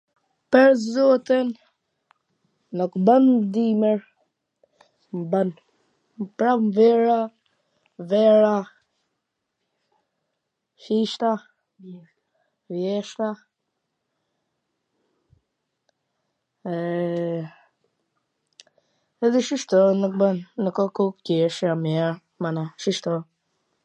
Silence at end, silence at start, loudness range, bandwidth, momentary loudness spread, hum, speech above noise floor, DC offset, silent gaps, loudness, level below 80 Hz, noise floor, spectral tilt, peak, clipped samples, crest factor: 0.6 s; 0.5 s; 12 LU; 9.4 kHz; 15 LU; none; 58 dB; under 0.1%; none; -22 LUFS; -78 dBFS; -79 dBFS; -6.5 dB/octave; -2 dBFS; under 0.1%; 22 dB